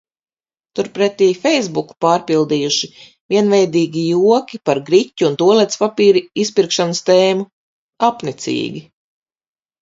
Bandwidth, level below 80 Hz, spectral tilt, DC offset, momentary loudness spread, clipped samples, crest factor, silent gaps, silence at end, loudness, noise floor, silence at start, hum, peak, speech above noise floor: 7.8 kHz; -64 dBFS; -4.5 dB/octave; under 0.1%; 10 LU; under 0.1%; 16 dB; 3.20-3.29 s, 7.53-7.89 s; 1 s; -15 LUFS; under -90 dBFS; 0.75 s; none; 0 dBFS; over 75 dB